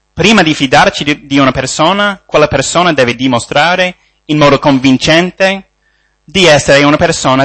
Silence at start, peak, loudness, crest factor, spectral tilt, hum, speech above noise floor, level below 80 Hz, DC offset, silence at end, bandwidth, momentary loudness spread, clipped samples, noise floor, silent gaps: 0.15 s; 0 dBFS; -9 LUFS; 10 dB; -4 dB/octave; none; 47 dB; -36 dBFS; 0.1%; 0 s; 11 kHz; 6 LU; 0.5%; -55 dBFS; none